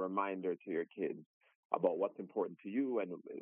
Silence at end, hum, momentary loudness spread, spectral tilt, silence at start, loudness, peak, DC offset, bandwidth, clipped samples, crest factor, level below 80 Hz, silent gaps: 0 s; none; 7 LU; -2.5 dB/octave; 0 s; -39 LUFS; -16 dBFS; under 0.1%; 3.6 kHz; under 0.1%; 22 dB; under -90 dBFS; 1.26-1.41 s, 1.55-1.70 s